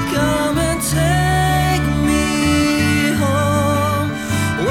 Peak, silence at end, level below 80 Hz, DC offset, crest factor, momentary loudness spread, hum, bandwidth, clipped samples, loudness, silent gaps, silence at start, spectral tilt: -2 dBFS; 0 s; -30 dBFS; under 0.1%; 14 dB; 3 LU; none; 19 kHz; under 0.1%; -16 LUFS; none; 0 s; -5 dB/octave